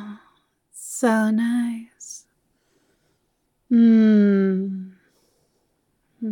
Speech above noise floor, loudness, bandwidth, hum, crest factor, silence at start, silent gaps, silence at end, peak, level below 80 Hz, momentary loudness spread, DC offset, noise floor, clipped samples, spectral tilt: 53 dB; -19 LUFS; 13 kHz; none; 16 dB; 0 s; none; 0 s; -8 dBFS; -78 dBFS; 23 LU; under 0.1%; -71 dBFS; under 0.1%; -6.5 dB/octave